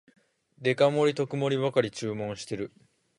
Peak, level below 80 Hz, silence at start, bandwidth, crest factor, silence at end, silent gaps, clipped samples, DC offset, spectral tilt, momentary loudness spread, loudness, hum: -10 dBFS; -68 dBFS; 0.6 s; 11.5 kHz; 18 dB; 0.5 s; none; under 0.1%; under 0.1%; -5.5 dB/octave; 12 LU; -28 LUFS; none